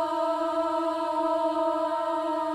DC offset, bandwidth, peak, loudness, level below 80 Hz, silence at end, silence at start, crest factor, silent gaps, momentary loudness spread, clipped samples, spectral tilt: under 0.1%; 12.5 kHz; -16 dBFS; -27 LUFS; -68 dBFS; 0 s; 0 s; 12 dB; none; 2 LU; under 0.1%; -4 dB/octave